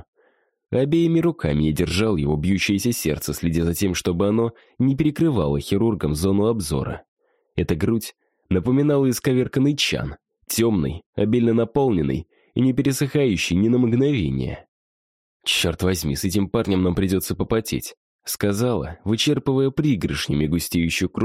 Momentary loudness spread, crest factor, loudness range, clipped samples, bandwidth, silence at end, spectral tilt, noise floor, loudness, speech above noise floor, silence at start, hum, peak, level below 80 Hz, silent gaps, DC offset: 8 LU; 14 dB; 2 LU; under 0.1%; 16 kHz; 0 s; -5.5 dB/octave; -63 dBFS; -21 LUFS; 42 dB; 0.7 s; none; -8 dBFS; -40 dBFS; 7.08-7.17 s, 11.06-11.13 s, 14.68-15.40 s, 17.97-18.19 s; under 0.1%